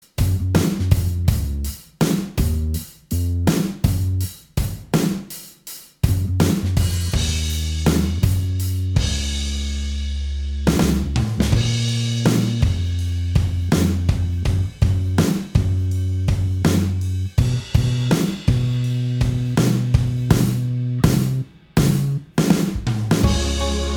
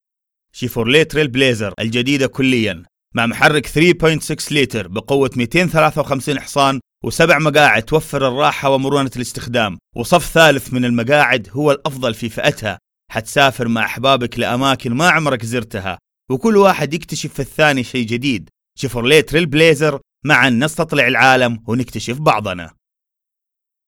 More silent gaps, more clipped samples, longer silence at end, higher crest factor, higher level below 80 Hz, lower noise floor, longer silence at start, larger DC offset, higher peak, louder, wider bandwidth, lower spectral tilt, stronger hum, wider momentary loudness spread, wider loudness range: neither; neither; second, 0 s vs 1.2 s; about the same, 18 dB vs 16 dB; first, -28 dBFS vs -42 dBFS; second, -39 dBFS vs -83 dBFS; second, 0.2 s vs 0.55 s; neither; about the same, 0 dBFS vs 0 dBFS; second, -20 LUFS vs -15 LUFS; about the same, 20 kHz vs 18.5 kHz; first, -6 dB/octave vs -4.5 dB/octave; neither; second, 7 LU vs 12 LU; about the same, 3 LU vs 3 LU